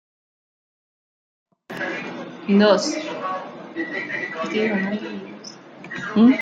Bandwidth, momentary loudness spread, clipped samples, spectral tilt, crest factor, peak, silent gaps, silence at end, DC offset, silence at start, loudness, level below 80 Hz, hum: 9 kHz; 19 LU; under 0.1%; -5.5 dB/octave; 20 dB; -2 dBFS; none; 0 s; under 0.1%; 1.7 s; -22 LUFS; -70 dBFS; none